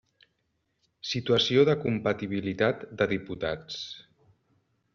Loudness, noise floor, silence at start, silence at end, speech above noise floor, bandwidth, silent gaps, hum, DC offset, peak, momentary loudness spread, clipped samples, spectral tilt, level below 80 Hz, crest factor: -27 LUFS; -76 dBFS; 1.05 s; 0.95 s; 49 dB; 7.2 kHz; none; none; under 0.1%; -10 dBFS; 15 LU; under 0.1%; -4 dB/octave; -62 dBFS; 20 dB